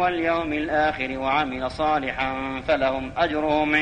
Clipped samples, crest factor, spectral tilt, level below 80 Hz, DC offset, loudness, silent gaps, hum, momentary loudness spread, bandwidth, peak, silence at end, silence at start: under 0.1%; 16 dB; -6 dB/octave; -44 dBFS; under 0.1%; -24 LUFS; none; none; 4 LU; 9.6 kHz; -8 dBFS; 0 s; 0 s